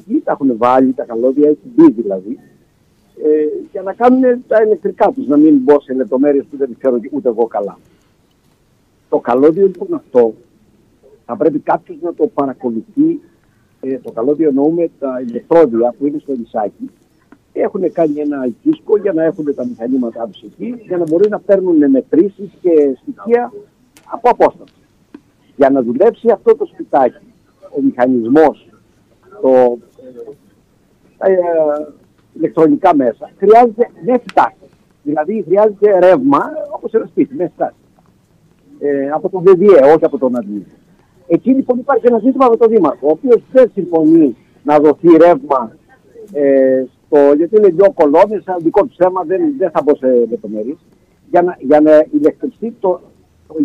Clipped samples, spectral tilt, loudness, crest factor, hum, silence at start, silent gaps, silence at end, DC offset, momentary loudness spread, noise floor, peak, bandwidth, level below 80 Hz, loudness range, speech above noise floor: under 0.1%; -8.5 dB/octave; -13 LUFS; 12 dB; none; 0.1 s; none; 0 s; under 0.1%; 13 LU; -55 dBFS; 0 dBFS; 6.8 kHz; -56 dBFS; 6 LU; 43 dB